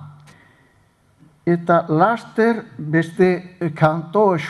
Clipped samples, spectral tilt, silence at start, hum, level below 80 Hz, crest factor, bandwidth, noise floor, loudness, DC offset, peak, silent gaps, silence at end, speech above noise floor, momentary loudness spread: under 0.1%; -8 dB/octave; 0 s; none; -58 dBFS; 18 dB; 11.5 kHz; -57 dBFS; -19 LUFS; under 0.1%; 0 dBFS; none; 0 s; 40 dB; 7 LU